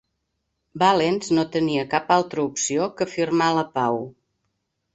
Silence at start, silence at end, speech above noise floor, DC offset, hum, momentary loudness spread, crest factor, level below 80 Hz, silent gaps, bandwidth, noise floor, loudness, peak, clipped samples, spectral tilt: 0.75 s; 0.85 s; 55 dB; under 0.1%; none; 6 LU; 20 dB; -62 dBFS; none; 8.2 kHz; -76 dBFS; -22 LUFS; -4 dBFS; under 0.1%; -4.5 dB/octave